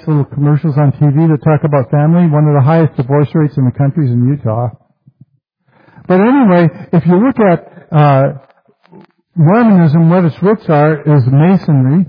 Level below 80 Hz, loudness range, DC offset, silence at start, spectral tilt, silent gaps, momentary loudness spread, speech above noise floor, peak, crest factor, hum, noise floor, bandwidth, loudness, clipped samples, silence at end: -50 dBFS; 3 LU; under 0.1%; 0.05 s; -12 dB/octave; none; 6 LU; 48 dB; 0 dBFS; 10 dB; none; -58 dBFS; 5 kHz; -10 LUFS; under 0.1%; 0.05 s